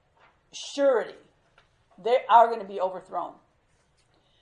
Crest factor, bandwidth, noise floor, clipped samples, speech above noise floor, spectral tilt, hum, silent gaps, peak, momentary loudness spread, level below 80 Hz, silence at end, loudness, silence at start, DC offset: 22 dB; 10 kHz; -67 dBFS; under 0.1%; 43 dB; -3 dB/octave; none; none; -6 dBFS; 20 LU; -74 dBFS; 1.1 s; -24 LUFS; 0.55 s; under 0.1%